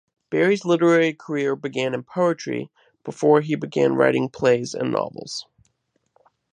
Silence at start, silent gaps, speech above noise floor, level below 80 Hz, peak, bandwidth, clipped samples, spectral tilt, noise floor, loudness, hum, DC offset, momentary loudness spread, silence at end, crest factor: 0.3 s; none; 50 dB; -66 dBFS; -4 dBFS; 10 kHz; under 0.1%; -6 dB/octave; -71 dBFS; -21 LUFS; none; under 0.1%; 14 LU; 1.15 s; 18 dB